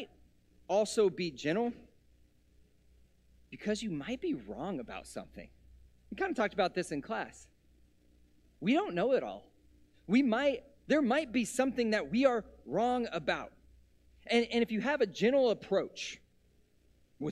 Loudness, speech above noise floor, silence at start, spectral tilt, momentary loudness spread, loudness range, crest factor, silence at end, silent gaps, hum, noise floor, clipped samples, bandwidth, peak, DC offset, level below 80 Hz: -33 LUFS; 36 dB; 0 s; -5 dB/octave; 15 LU; 9 LU; 20 dB; 0 s; none; 60 Hz at -60 dBFS; -68 dBFS; under 0.1%; 13.5 kHz; -14 dBFS; under 0.1%; -64 dBFS